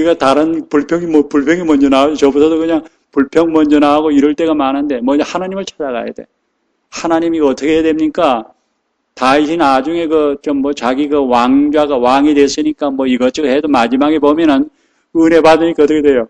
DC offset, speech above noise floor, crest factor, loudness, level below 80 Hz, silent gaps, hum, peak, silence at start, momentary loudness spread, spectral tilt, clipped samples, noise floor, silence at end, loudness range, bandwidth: under 0.1%; 54 dB; 12 dB; -12 LUFS; -44 dBFS; none; none; 0 dBFS; 0 s; 8 LU; -5 dB/octave; 0.2%; -66 dBFS; 0.05 s; 5 LU; 9.8 kHz